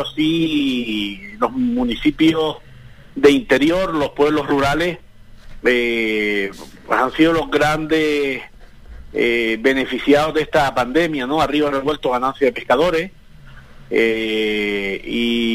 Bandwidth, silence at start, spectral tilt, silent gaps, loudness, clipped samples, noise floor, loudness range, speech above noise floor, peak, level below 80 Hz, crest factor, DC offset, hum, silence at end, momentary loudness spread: 16 kHz; 0 s; -5 dB/octave; none; -18 LUFS; under 0.1%; -42 dBFS; 2 LU; 24 dB; -2 dBFS; -40 dBFS; 16 dB; 0.5%; none; 0 s; 8 LU